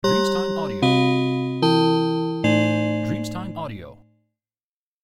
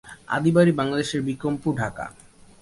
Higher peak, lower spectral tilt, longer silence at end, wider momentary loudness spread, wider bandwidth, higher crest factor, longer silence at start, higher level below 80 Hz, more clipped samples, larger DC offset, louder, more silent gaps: about the same, -8 dBFS vs -6 dBFS; about the same, -6 dB/octave vs -6.5 dB/octave; first, 1.1 s vs 0.5 s; about the same, 12 LU vs 12 LU; first, 15 kHz vs 11.5 kHz; about the same, 14 dB vs 18 dB; about the same, 0.05 s vs 0.05 s; about the same, -52 dBFS vs -54 dBFS; neither; neither; about the same, -21 LUFS vs -23 LUFS; neither